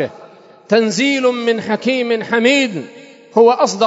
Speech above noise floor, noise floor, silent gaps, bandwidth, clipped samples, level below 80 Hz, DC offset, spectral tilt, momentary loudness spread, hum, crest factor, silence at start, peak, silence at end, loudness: 27 dB; -41 dBFS; none; 8 kHz; under 0.1%; -68 dBFS; under 0.1%; -4 dB/octave; 9 LU; none; 16 dB; 0 s; 0 dBFS; 0 s; -15 LUFS